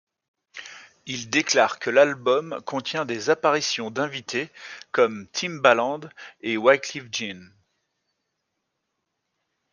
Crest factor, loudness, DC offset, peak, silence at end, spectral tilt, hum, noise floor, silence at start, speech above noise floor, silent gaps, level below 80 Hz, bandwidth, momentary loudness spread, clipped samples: 24 dB; -23 LUFS; under 0.1%; -2 dBFS; 2.3 s; -3 dB/octave; none; -79 dBFS; 0.55 s; 55 dB; none; -74 dBFS; 9.8 kHz; 21 LU; under 0.1%